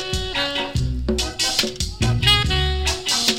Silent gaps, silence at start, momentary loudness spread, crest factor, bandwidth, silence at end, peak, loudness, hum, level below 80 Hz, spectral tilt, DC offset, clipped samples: none; 0 s; 8 LU; 20 dB; 17 kHz; 0 s; -2 dBFS; -20 LUFS; none; -28 dBFS; -3 dB/octave; under 0.1%; under 0.1%